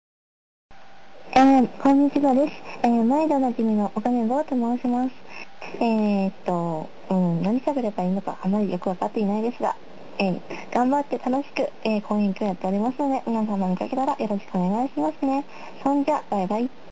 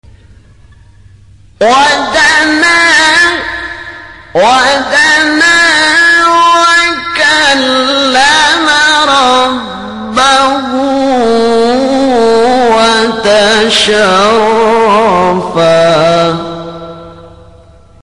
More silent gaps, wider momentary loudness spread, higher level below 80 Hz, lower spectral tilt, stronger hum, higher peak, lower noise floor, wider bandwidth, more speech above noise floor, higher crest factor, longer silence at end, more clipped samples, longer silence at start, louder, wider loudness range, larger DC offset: neither; about the same, 9 LU vs 11 LU; second, -62 dBFS vs -40 dBFS; first, -8 dB/octave vs -2.5 dB/octave; neither; second, -8 dBFS vs 0 dBFS; first, -49 dBFS vs -38 dBFS; second, 8 kHz vs 11.5 kHz; second, 26 dB vs 31 dB; first, 14 dB vs 8 dB; second, 0.25 s vs 0.65 s; neither; second, 1.25 s vs 1.6 s; second, -23 LUFS vs -7 LUFS; about the same, 5 LU vs 3 LU; first, 1% vs under 0.1%